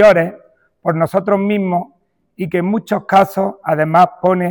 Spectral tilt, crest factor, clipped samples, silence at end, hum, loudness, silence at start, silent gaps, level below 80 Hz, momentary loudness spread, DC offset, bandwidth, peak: -7.5 dB/octave; 12 dB; under 0.1%; 0 s; none; -15 LUFS; 0 s; none; -54 dBFS; 10 LU; under 0.1%; 20 kHz; -2 dBFS